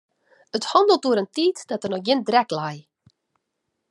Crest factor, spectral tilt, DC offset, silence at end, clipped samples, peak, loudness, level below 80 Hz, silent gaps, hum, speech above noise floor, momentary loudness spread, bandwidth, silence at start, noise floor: 20 dB; -4.5 dB/octave; under 0.1%; 1.1 s; under 0.1%; -2 dBFS; -22 LUFS; -76 dBFS; none; none; 57 dB; 12 LU; 11.5 kHz; 0.55 s; -78 dBFS